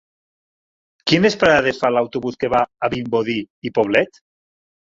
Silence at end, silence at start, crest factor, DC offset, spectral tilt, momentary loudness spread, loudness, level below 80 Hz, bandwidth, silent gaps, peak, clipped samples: 0.8 s; 1.05 s; 20 dB; under 0.1%; -5.5 dB/octave; 10 LU; -18 LUFS; -52 dBFS; 7.8 kHz; 3.50-3.62 s; 0 dBFS; under 0.1%